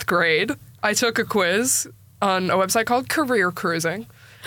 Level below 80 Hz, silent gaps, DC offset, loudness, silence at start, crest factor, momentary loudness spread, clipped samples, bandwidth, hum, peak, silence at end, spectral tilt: -60 dBFS; none; under 0.1%; -21 LUFS; 0 s; 14 dB; 7 LU; under 0.1%; 19 kHz; none; -8 dBFS; 0 s; -3 dB/octave